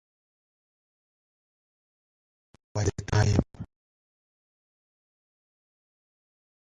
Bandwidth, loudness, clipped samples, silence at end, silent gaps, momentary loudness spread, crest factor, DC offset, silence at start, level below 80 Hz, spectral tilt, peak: 9.4 kHz; -27 LUFS; under 0.1%; 3.05 s; none; 21 LU; 26 dB; under 0.1%; 2.75 s; -44 dBFS; -6 dB/octave; -8 dBFS